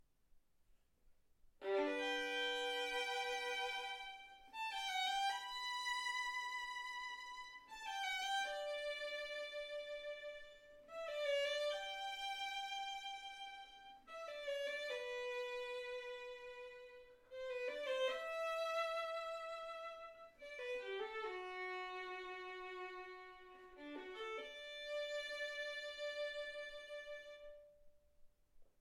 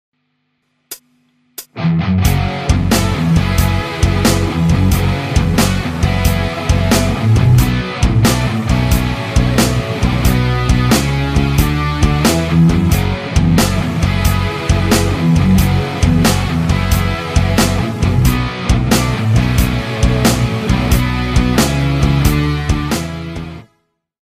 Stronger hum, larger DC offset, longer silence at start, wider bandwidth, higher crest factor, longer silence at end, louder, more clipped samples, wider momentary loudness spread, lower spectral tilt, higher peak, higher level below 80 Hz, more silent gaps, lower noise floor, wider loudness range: neither; neither; second, 0.3 s vs 0.9 s; about the same, 16.5 kHz vs 15.5 kHz; about the same, 16 dB vs 14 dB; second, 0.1 s vs 0.6 s; second, -44 LUFS vs -14 LUFS; neither; first, 14 LU vs 5 LU; second, -0.5 dB/octave vs -5.5 dB/octave; second, -28 dBFS vs 0 dBFS; second, -76 dBFS vs -20 dBFS; neither; first, -72 dBFS vs -65 dBFS; first, 6 LU vs 2 LU